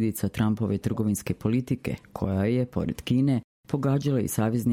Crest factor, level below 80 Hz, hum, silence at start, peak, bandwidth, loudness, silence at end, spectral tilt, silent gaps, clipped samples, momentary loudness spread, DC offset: 14 dB; -50 dBFS; none; 0 s; -10 dBFS; 16.5 kHz; -27 LUFS; 0 s; -7 dB/octave; 3.44-3.63 s; under 0.1%; 6 LU; under 0.1%